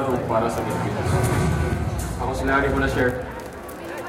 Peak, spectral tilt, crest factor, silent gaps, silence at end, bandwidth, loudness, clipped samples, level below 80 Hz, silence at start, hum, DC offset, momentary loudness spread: -8 dBFS; -6 dB/octave; 16 dB; none; 0 s; 16.5 kHz; -23 LUFS; under 0.1%; -34 dBFS; 0 s; none; under 0.1%; 12 LU